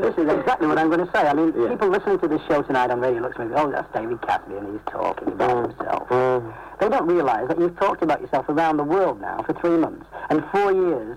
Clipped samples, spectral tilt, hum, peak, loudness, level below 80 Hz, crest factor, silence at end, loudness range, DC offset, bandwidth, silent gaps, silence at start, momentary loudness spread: under 0.1%; -7 dB/octave; none; -14 dBFS; -22 LUFS; -52 dBFS; 8 dB; 0 s; 3 LU; under 0.1%; 11 kHz; none; 0 s; 7 LU